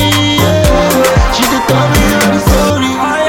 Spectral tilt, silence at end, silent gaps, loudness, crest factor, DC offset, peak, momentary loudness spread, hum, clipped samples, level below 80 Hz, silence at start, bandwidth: -4.5 dB/octave; 0 s; none; -10 LUFS; 10 dB; under 0.1%; 0 dBFS; 2 LU; none; under 0.1%; -18 dBFS; 0 s; 17.5 kHz